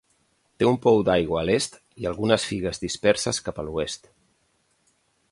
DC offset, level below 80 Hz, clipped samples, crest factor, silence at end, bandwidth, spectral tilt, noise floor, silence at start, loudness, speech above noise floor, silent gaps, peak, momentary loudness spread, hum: under 0.1%; -50 dBFS; under 0.1%; 18 dB; 1.35 s; 11.5 kHz; -4.5 dB/octave; -68 dBFS; 0.6 s; -24 LUFS; 45 dB; none; -6 dBFS; 12 LU; none